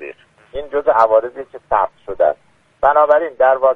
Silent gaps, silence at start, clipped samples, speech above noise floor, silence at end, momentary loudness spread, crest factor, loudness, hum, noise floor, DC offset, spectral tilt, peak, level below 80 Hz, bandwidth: none; 0 s; under 0.1%; 23 dB; 0 s; 18 LU; 16 dB; -15 LUFS; none; -37 dBFS; under 0.1%; -6 dB/octave; 0 dBFS; -46 dBFS; 5.6 kHz